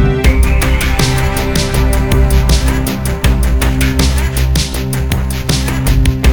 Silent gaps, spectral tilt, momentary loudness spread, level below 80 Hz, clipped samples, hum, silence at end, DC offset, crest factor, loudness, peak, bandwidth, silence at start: none; -5 dB/octave; 4 LU; -14 dBFS; under 0.1%; none; 0 s; 2%; 12 dB; -13 LUFS; 0 dBFS; 19.5 kHz; 0 s